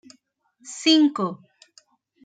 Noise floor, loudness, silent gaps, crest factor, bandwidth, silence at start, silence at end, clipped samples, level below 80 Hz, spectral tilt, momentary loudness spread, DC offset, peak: -64 dBFS; -20 LUFS; none; 20 dB; 9.2 kHz; 0.65 s; 0.9 s; under 0.1%; -82 dBFS; -3.5 dB/octave; 22 LU; under 0.1%; -4 dBFS